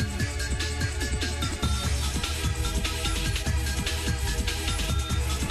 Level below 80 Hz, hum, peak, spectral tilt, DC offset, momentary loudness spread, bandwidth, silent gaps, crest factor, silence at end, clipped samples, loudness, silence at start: -30 dBFS; none; -14 dBFS; -3.5 dB/octave; under 0.1%; 2 LU; 13.5 kHz; none; 14 dB; 0 s; under 0.1%; -28 LUFS; 0 s